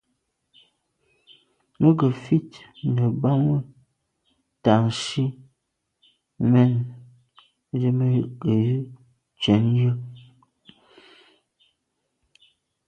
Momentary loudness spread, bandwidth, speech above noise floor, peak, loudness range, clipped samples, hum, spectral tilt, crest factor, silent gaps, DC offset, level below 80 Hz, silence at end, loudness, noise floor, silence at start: 13 LU; 9.6 kHz; 56 dB; -4 dBFS; 3 LU; under 0.1%; none; -7.5 dB/octave; 20 dB; none; under 0.1%; -58 dBFS; 2.7 s; -22 LUFS; -77 dBFS; 1.8 s